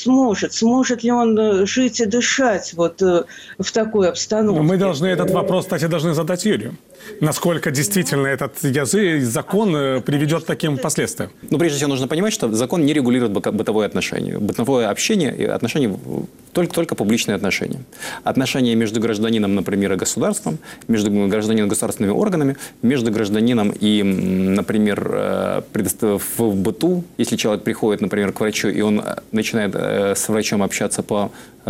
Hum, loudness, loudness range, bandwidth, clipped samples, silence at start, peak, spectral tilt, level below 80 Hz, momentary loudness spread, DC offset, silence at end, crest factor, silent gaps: none; -19 LUFS; 2 LU; 16.5 kHz; under 0.1%; 0 s; -6 dBFS; -5 dB/octave; -54 dBFS; 5 LU; under 0.1%; 0 s; 12 dB; none